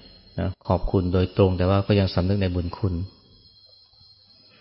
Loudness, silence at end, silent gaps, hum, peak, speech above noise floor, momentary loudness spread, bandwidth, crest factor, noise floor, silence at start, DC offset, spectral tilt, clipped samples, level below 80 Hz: -23 LUFS; 1.5 s; none; none; -6 dBFS; 32 dB; 10 LU; 5.8 kHz; 18 dB; -54 dBFS; 0.35 s; under 0.1%; -12 dB/octave; under 0.1%; -40 dBFS